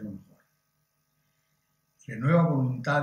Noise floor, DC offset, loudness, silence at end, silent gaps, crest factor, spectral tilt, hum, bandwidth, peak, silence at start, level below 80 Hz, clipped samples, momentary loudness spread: -75 dBFS; under 0.1%; -25 LUFS; 0 s; none; 18 dB; -8.5 dB/octave; none; 7 kHz; -12 dBFS; 0 s; -70 dBFS; under 0.1%; 19 LU